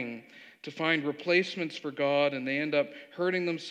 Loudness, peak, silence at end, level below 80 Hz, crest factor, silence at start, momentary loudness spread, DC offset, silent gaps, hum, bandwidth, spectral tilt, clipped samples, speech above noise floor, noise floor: -29 LUFS; -12 dBFS; 0 s; under -90 dBFS; 18 dB; 0 s; 12 LU; under 0.1%; none; none; 9.4 kHz; -5.5 dB/octave; under 0.1%; 19 dB; -49 dBFS